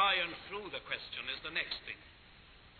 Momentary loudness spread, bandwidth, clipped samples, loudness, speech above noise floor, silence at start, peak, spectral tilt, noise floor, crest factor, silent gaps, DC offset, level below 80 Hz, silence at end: 23 LU; 4.6 kHz; under 0.1%; -38 LUFS; 16 dB; 0 s; -18 dBFS; -4.5 dB/octave; -59 dBFS; 20 dB; none; under 0.1%; -64 dBFS; 0 s